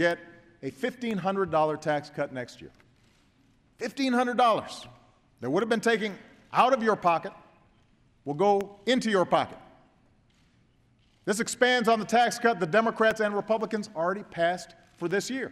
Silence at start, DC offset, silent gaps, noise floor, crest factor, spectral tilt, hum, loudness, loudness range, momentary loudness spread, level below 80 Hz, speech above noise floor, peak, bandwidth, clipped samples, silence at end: 0 s; under 0.1%; none; -64 dBFS; 20 dB; -4.5 dB/octave; none; -27 LUFS; 5 LU; 15 LU; -68 dBFS; 38 dB; -8 dBFS; 14 kHz; under 0.1%; 0 s